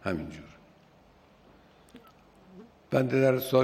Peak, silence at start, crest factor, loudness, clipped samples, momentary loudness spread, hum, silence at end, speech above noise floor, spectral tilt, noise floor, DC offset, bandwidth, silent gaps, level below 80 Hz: -10 dBFS; 0.05 s; 20 dB; -27 LUFS; under 0.1%; 19 LU; none; 0 s; 33 dB; -7 dB/octave; -59 dBFS; under 0.1%; 15 kHz; none; -62 dBFS